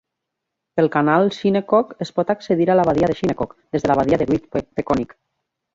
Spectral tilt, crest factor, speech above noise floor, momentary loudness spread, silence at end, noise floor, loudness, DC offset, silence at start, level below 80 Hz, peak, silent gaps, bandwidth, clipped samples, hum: -7.5 dB/octave; 18 dB; 62 dB; 9 LU; 0.7 s; -80 dBFS; -19 LUFS; under 0.1%; 0.75 s; -48 dBFS; -2 dBFS; none; 7.8 kHz; under 0.1%; none